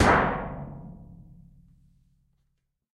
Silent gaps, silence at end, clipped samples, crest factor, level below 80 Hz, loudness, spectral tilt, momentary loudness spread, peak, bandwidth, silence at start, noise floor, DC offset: none; 1.8 s; under 0.1%; 22 dB; -42 dBFS; -26 LUFS; -5.5 dB/octave; 27 LU; -8 dBFS; 13.5 kHz; 0 s; -76 dBFS; under 0.1%